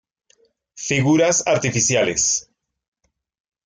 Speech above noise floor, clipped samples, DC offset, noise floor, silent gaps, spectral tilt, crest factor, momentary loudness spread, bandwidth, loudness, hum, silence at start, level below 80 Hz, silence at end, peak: 55 dB; under 0.1%; under 0.1%; -73 dBFS; none; -3.5 dB/octave; 16 dB; 7 LU; 10.5 kHz; -18 LUFS; none; 0.75 s; -56 dBFS; 1.25 s; -6 dBFS